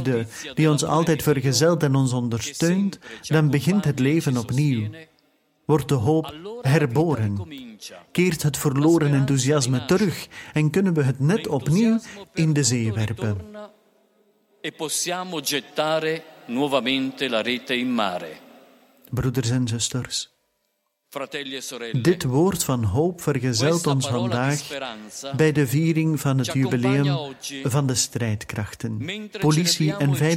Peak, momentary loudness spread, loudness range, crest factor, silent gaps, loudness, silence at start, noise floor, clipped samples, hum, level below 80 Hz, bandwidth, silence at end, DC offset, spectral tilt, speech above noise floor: -4 dBFS; 12 LU; 5 LU; 18 dB; none; -22 LUFS; 0 s; -73 dBFS; under 0.1%; none; -54 dBFS; 16.5 kHz; 0 s; under 0.1%; -5 dB/octave; 51 dB